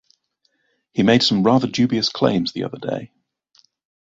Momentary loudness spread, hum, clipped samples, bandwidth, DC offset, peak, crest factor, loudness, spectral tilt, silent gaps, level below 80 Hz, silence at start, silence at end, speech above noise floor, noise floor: 13 LU; none; under 0.1%; 7.8 kHz; under 0.1%; -2 dBFS; 20 dB; -19 LUFS; -5.5 dB/octave; none; -56 dBFS; 0.95 s; 1 s; 50 dB; -68 dBFS